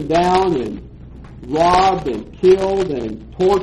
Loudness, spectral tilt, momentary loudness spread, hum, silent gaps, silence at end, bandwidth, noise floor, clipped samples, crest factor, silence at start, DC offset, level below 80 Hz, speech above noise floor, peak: -16 LUFS; -6 dB/octave; 15 LU; none; none; 0 s; 11.5 kHz; -36 dBFS; under 0.1%; 14 dB; 0 s; under 0.1%; -38 dBFS; 20 dB; -2 dBFS